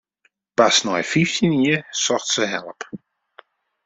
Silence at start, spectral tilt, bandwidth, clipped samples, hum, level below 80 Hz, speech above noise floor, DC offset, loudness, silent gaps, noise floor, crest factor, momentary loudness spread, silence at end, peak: 0.6 s; -3.5 dB/octave; 8.2 kHz; under 0.1%; none; -60 dBFS; 46 dB; under 0.1%; -19 LUFS; none; -66 dBFS; 20 dB; 19 LU; 0.9 s; -2 dBFS